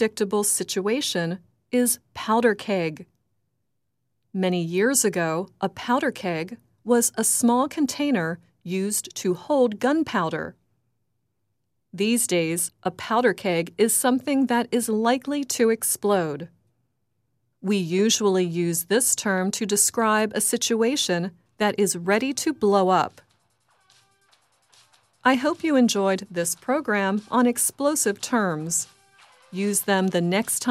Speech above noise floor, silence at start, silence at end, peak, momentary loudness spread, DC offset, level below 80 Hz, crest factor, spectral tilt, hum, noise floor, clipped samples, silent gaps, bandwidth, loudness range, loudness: 56 dB; 0 s; 0 s; -4 dBFS; 9 LU; under 0.1%; -70 dBFS; 20 dB; -3.5 dB/octave; none; -78 dBFS; under 0.1%; none; 16 kHz; 4 LU; -23 LUFS